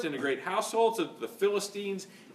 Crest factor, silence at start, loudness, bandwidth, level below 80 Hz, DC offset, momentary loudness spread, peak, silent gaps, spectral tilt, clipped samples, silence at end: 18 dB; 0 s; -31 LUFS; 15.5 kHz; -88 dBFS; under 0.1%; 9 LU; -14 dBFS; none; -3.5 dB/octave; under 0.1%; 0 s